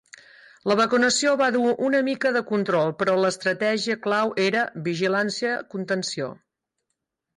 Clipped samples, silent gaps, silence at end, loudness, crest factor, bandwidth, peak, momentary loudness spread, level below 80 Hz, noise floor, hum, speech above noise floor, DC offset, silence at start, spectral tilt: under 0.1%; none; 1.05 s; -23 LUFS; 14 dB; 11.5 kHz; -10 dBFS; 7 LU; -68 dBFS; -80 dBFS; none; 58 dB; under 0.1%; 0.65 s; -4 dB/octave